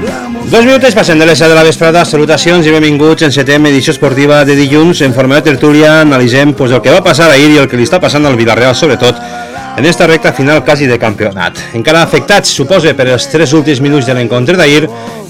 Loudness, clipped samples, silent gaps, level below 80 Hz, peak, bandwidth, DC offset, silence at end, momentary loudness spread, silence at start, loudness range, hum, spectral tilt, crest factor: -6 LUFS; 10%; none; -38 dBFS; 0 dBFS; 17.5 kHz; 0.9%; 0 s; 6 LU; 0 s; 3 LU; none; -5 dB/octave; 6 dB